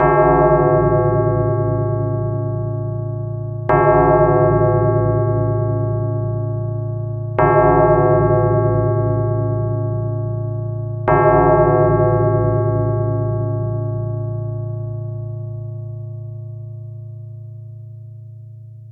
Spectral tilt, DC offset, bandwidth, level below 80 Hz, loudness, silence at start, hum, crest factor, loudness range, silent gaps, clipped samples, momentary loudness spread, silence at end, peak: -13.5 dB/octave; under 0.1%; 3 kHz; -34 dBFS; -17 LUFS; 0 s; none; 14 dB; 12 LU; none; under 0.1%; 19 LU; 0 s; -4 dBFS